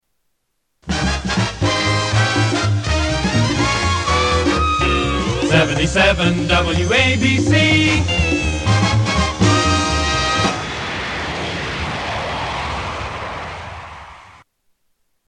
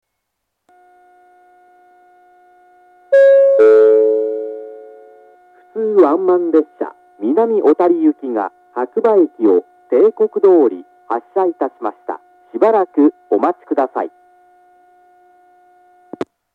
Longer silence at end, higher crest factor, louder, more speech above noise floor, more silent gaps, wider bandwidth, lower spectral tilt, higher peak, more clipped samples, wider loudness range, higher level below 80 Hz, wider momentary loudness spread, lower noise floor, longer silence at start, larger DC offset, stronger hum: second, 1.05 s vs 2.45 s; about the same, 16 dB vs 16 dB; second, -17 LUFS vs -14 LUFS; second, 54 dB vs 61 dB; neither; first, 10.5 kHz vs 4.8 kHz; second, -4.5 dB/octave vs -8 dB/octave; about the same, 0 dBFS vs 0 dBFS; neither; first, 9 LU vs 5 LU; first, -30 dBFS vs -80 dBFS; second, 10 LU vs 19 LU; second, -69 dBFS vs -75 dBFS; second, 0.85 s vs 3.1 s; neither; neither